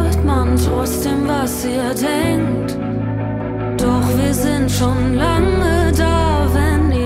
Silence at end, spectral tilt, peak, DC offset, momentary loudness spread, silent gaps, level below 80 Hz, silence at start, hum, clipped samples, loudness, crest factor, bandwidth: 0 s; -6 dB/octave; -2 dBFS; under 0.1%; 6 LU; none; -24 dBFS; 0 s; none; under 0.1%; -17 LUFS; 14 dB; 16 kHz